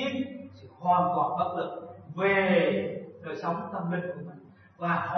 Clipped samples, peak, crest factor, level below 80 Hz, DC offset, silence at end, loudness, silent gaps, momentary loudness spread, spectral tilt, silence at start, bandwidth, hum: under 0.1%; -12 dBFS; 18 dB; -74 dBFS; under 0.1%; 0 s; -28 LUFS; none; 17 LU; -7.5 dB/octave; 0 s; 6.2 kHz; none